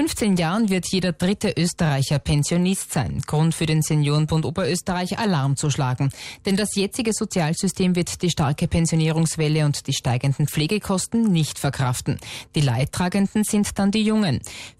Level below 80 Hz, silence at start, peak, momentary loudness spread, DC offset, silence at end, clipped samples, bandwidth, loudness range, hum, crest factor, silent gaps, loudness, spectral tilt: -44 dBFS; 0 s; -10 dBFS; 4 LU; under 0.1%; 0.1 s; under 0.1%; 15.5 kHz; 1 LU; none; 12 dB; none; -22 LUFS; -5.5 dB/octave